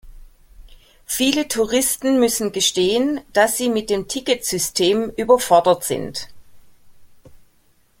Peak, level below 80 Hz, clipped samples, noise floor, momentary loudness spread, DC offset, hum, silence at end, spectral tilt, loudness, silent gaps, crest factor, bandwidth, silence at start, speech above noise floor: -2 dBFS; -48 dBFS; under 0.1%; -57 dBFS; 9 LU; under 0.1%; none; 0.65 s; -2.5 dB/octave; -18 LUFS; none; 18 dB; 17 kHz; 0.05 s; 39 dB